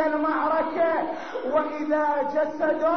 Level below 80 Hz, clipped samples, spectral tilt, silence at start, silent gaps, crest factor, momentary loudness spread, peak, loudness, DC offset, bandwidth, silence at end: -62 dBFS; under 0.1%; -3 dB/octave; 0 s; none; 12 dB; 4 LU; -12 dBFS; -25 LUFS; 0.5%; 6.4 kHz; 0 s